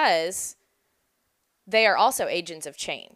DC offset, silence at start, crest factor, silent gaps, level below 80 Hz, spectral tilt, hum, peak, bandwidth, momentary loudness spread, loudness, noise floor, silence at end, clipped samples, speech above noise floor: under 0.1%; 0 s; 20 dB; none; -70 dBFS; -1 dB/octave; none; -6 dBFS; 15.5 kHz; 14 LU; -23 LUFS; -74 dBFS; 0.15 s; under 0.1%; 49 dB